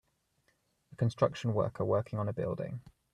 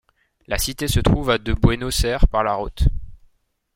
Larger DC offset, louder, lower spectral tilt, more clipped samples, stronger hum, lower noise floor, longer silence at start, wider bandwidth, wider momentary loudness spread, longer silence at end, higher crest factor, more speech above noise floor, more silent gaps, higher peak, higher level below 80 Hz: neither; second, -33 LUFS vs -21 LUFS; first, -8 dB/octave vs -5 dB/octave; neither; neither; first, -75 dBFS vs -61 dBFS; first, 0.9 s vs 0.5 s; second, 10.5 kHz vs 16.5 kHz; first, 9 LU vs 5 LU; second, 0.25 s vs 0.6 s; about the same, 20 dB vs 18 dB; about the same, 43 dB vs 43 dB; neither; second, -14 dBFS vs -2 dBFS; second, -66 dBFS vs -24 dBFS